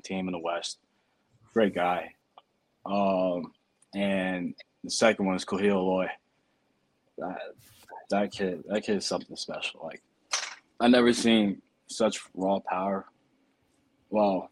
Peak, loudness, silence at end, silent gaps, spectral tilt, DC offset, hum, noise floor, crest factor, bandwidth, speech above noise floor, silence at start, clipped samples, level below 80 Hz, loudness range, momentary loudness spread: -8 dBFS; -28 LUFS; 0.05 s; none; -4.5 dB/octave; under 0.1%; none; -72 dBFS; 22 dB; 12.5 kHz; 45 dB; 0.05 s; under 0.1%; -68 dBFS; 6 LU; 18 LU